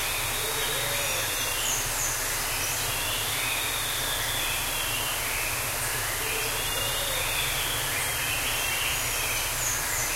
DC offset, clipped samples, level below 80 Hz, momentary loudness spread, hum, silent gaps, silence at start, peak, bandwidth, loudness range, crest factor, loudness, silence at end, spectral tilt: under 0.1%; under 0.1%; -42 dBFS; 1 LU; none; none; 0 s; -14 dBFS; 16 kHz; 1 LU; 14 dB; -26 LUFS; 0 s; -0.5 dB/octave